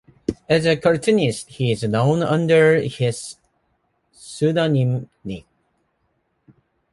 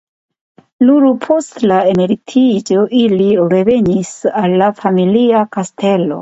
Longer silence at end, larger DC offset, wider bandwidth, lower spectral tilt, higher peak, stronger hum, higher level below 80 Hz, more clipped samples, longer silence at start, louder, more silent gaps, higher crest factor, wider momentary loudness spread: first, 1.55 s vs 0 s; neither; first, 11.5 kHz vs 8 kHz; about the same, -6 dB/octave vs -6.5 dB/octave; second, -4 dBFS vs 0 dBFS; neither; about the same, -54 dBFS vs -52 dBFS; neither; second, 0.3 s vs 0.8 s; second, -19 LUFS vs -12 LUFS; neither; first, 18 dB vs 12 dB; first, 18 LU vs 4 LU